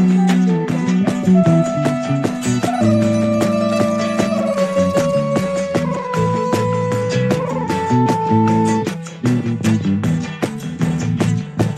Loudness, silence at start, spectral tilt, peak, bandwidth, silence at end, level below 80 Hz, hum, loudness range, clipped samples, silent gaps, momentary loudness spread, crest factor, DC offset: -17 LUFS; 0 s; -7 dB/octave; -2 dBFS; 13.5 kHz; 0 s; -48 dBFS; none; 2 LU; under 0.1%; none; 6 LU; 14 dB; under 0.1%